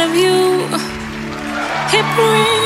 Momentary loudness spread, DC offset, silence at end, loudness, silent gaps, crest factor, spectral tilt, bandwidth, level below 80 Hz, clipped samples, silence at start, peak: 12 LU; under 0.1%; 0 s; -15 LUFS; none; 14 dB; -4 dB/octave; 16 kHz; -44 dBFS; under 0.1%; 0 s; 0 dBFS